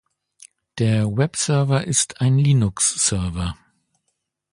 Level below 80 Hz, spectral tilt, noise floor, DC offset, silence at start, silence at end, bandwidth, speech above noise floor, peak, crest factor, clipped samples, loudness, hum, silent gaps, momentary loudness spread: -42 dBFS; -4.5 dB/octave; -75 dBFS; under 0.1%; 0.75 s; 1 s; 11.5 kHz; 56 dB; -4 dBFS; 16 dB; under 0.1%; -19 LUFS; none; none; 11 LU